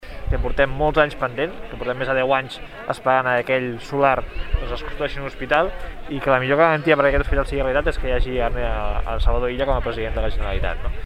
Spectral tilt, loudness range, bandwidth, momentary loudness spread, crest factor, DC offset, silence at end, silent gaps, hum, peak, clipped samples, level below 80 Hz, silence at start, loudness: -6.5 dB/octave; 3 LU; 10.5 kHz; 11 LU; 18 dB; under 0.1%; 0 s; none; none; -2 dBFS; under 0.1%; -26 dBFS; 0 s; -21 LUFS